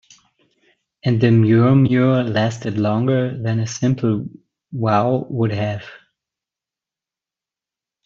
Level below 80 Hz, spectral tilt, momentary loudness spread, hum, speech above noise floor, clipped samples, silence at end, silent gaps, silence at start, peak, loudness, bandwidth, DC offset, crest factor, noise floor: -56 dBFS; -7.5 dB/octave; 12 LU; none; 72 dB; under 0.1%; 2.1 s; none; 1.05 s; -2 dBFS; -18 LUFS; 7.4 kHz; under 0.1%; 16 dB; -89 dBFS